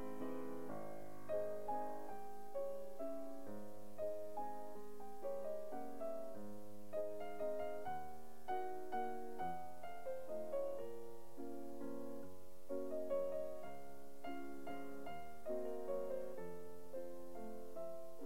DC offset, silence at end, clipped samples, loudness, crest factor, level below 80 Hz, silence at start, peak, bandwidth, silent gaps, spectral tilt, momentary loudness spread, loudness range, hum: 0.7%; 0 s; under 0.1%; -48 LUFS; 16 dB; -74 dBFS; 0 s; -30 dBFS; 16 kHz; none; -6 dB/octave; 10 LU; 2 LU; none